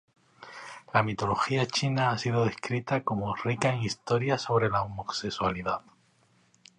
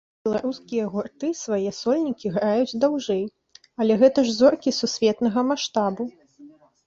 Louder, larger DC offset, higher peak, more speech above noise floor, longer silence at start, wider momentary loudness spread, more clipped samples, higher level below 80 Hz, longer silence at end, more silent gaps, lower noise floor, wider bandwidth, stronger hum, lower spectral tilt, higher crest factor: second, -29 LUFS vs -23 LUFS; neither; second, -8 dBFS vs -4 dBFS; first, 37 dB vs 27 dB; first, 0.4 s vs 0.25 s; second, 7 LU vs 11 LU; neither; first, -58 dBFS vs -64 dBFS; first, 1 s vs 0.4 s; neither; first, -65 dBFS vs -49 dBFS; first, 10 kHz vs 7.8 kHz; neither; about the same, -5.5 dB/octave vs -5 dB/octave; about the same, 20 dB vs 18 dB